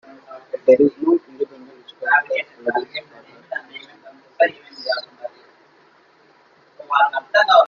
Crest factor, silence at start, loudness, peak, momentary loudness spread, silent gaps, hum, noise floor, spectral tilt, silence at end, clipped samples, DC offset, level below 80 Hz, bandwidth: 20 dB; 0.3 s; -19 LUFS; -2 dBFS; 22 LU; none; none; -54 dBFS; -4.5 dB/octave; 0 s; under 0.1%; under 0.1%; -70 dBFS; 7 kHz